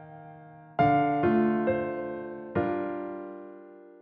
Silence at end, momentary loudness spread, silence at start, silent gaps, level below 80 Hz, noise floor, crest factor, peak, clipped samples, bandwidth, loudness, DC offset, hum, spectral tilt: 0.1 s; 23 LU; 0 s; none; -60 dBFS; -49 dBFS; 16 dB; -12 dBFS; under 0.1%; 5 kHz; -28 LUFS; under 0.1%; none; -7 dB/octave